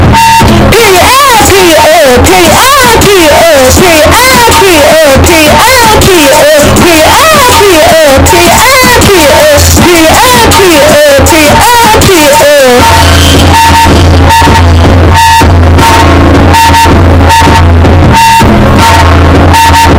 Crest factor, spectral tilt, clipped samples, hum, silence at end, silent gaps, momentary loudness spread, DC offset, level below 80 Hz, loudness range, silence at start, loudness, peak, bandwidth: 2 dB; -4 dB/octave; 20%; none; 0 s; none; 2 LU; under 0.1%; -12 dBFS; 1 LU; 0 s; -1 LUFS; 0 dBFS; over 20 kHz